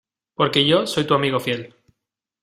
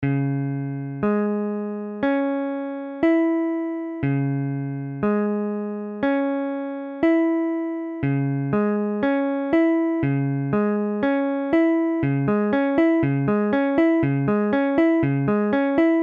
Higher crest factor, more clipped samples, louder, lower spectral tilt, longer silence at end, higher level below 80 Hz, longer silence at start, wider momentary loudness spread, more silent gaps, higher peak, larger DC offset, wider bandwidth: first, 20 dB vs 14 dB; neither; first, -19 LUFS vs -22 LUFS; second, -5 dB/octave vs -10.5 dB/octave; first, 0.75 s vs 0 s; about the same, -58 dBFS vs -54 dBFS; first, 0.4 s vs 0 s; first, 11 LU vs 8 LU; neither; first, -2 dBFS vs -8 dBFS; neither; first, 16 kHz vs 4.6 kHz